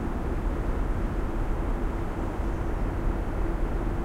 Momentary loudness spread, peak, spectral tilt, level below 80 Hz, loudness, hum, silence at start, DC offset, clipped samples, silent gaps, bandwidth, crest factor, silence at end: 1 LU; -16 dBFS; -8 dB/octave; -28 dBFS; -31 LUFS; none; 0 s; under 0.1%; under 0.1%; none; 10 kHz; 12 dB; 0 s